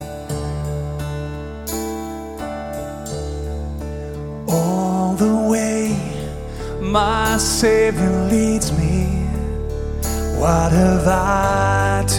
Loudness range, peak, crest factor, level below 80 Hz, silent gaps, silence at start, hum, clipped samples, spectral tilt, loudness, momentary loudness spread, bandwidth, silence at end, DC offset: 9 LU; -2 dBFS; 16 dB; -28 dBFS; none; 0 s; none; under 0.1%; -5.5 dB/octave; -20 LUFS; 13 LU; 19 kHz; 0 s; under 0.1%